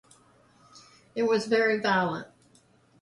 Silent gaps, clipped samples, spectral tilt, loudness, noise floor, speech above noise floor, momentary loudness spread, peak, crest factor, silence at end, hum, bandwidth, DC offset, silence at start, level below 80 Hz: none; under 0.1%; -5 dB/octave; -26 LUFS; -62 dBFS; 36 dB; 13 LU; -12 dBFS; 18 dB; 0.75 s; none; 11.5 kHz; under 0.1%; 0.75 s; -70 dBFS